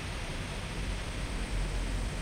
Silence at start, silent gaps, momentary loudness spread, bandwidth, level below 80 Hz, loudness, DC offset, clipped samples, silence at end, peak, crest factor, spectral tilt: 0 s; none; 2 LU; 15 kHz; -36 dBFS; -37 LUFS; under 0.1%; under 0.1%; 0 s; -22 dBFS; 12 dB; -4.5 dB/octave